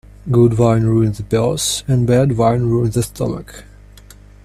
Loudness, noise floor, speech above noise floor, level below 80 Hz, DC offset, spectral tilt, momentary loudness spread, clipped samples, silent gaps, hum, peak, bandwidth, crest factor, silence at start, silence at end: -16 LUFS; -41 dBFS; 26 dB; -38 dBFS; under 0.1%; -6.5 dB/octave; 9 LU; under 0.1%; none; 50 Hz at -35 dBFS; 0 dBFS; 14 kHz; 16 dB; 0.25 s; 0.85 s